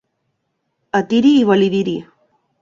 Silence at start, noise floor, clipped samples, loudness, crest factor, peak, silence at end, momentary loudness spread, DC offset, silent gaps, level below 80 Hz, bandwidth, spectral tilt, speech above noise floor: 0.95 s; -71 dBFS; under 0.1%; -15 LUFS; 16 dB; -2 dBFS; 0.6 s; 11 LU; under 0.1%; none; -60 dBFS; 7.4 kHz; -6.5 dB/octave; 57 dB